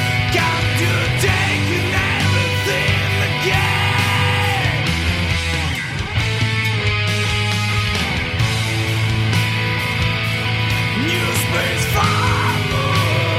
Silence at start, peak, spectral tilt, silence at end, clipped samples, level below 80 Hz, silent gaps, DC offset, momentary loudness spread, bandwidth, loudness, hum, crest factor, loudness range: 0 s; -2 dBFS; -4.5 dB/octave; 0 s; under 0.1%; -34 dBFS; none; under 0.1%; 3 LU; 16 kHz; -17 LUFS; none; 14 dB; 2 LU